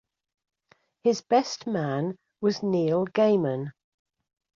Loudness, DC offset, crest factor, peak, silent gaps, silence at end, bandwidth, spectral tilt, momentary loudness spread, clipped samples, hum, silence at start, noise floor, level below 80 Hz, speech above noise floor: -26 LUFS; under 0.1%; 18 dB; -8 dBFS; none; 0.9 s; 7.6 kHz; -6 dB/octave; 8 LU; under 0.1%; none; 1.05 s; -65 dBFS; -72 dBFS; 40 dB